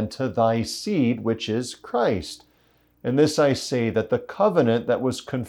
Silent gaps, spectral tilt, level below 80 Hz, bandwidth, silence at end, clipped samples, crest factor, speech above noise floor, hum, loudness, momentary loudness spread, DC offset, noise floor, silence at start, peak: none; -5.5 dB/octave; -58 dBFS; 18 kHz; 0 s; under 0.1%; 16 dB; 39 dB; none; -23 LUFS; 9 LU; under 0.1%; -61 dBFS; 0 s; -8 dBFS